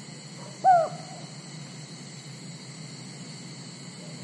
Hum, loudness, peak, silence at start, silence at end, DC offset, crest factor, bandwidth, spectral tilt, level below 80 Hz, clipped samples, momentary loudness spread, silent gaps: none; -29 LUFS; -10 dBFS; 0 s; 0 s; under 0.1%; 20 dB; 11.5 kHz; -4.5 dB/octave; -82 dBFS; under 0.1%; 20 LU; none